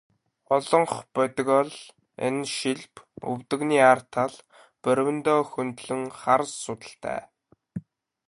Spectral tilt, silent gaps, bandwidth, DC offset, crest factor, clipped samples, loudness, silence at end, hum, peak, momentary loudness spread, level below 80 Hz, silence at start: -4.5 dB/octave; none; 11.5 kHz; under 0.1%; 22 dB; under 0.1%; -25 LUFS; 0.5 s; none; -4 dBFS; 17 LU; -68 dBFS; 0.5 s